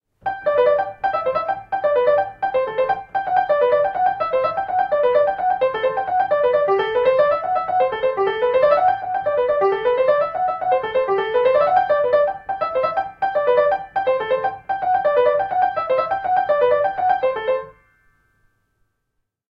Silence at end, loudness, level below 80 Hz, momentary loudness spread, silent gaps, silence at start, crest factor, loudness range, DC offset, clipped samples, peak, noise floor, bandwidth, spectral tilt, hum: 1.8 s; -19 LUFS; -56 dBFS; 6 LU; none; 0.25 s; 16 dB; 2 LU; under 0.1%; under 0.1%; -4 dBFS; -74 dBFS; 5.2 kHz; -6.5 dB/octave; none